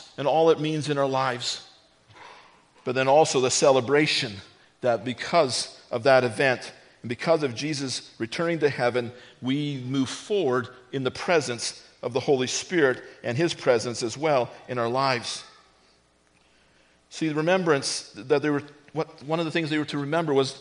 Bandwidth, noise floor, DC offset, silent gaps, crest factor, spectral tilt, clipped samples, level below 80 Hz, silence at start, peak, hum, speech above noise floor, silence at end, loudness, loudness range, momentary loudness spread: 10.5 kHz; -63 dBFS; under 0.1%; none; 22 dB; -4 dB/octave; under 0.1%; -70 dBFS; 0 s; -4 dBFS; none; 38 dB; 0 s; -25 LUFS; 5 LU; 12 LU